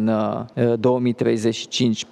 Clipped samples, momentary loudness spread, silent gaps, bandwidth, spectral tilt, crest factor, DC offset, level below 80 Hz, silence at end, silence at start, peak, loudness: under 0.1%; 4 LU; none; 11 kHz; -5.5 dB/octave; 14 dB; under 0.1%; -64 dBFS; 0.1 s; 0 s; -6 dBFS; -21 LUFS